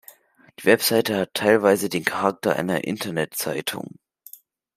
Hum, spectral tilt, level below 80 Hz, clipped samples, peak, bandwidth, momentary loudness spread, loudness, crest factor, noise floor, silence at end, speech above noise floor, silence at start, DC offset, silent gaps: none; -4 dB/octave; -68 dBFS; under 0.1%; -2 dBFS; 16 kHz; 9 LU; -22 LUFS; 22 dB; -51 dBFS; 0.95 s; 30 dB; 0.6 s; under 0.1%; none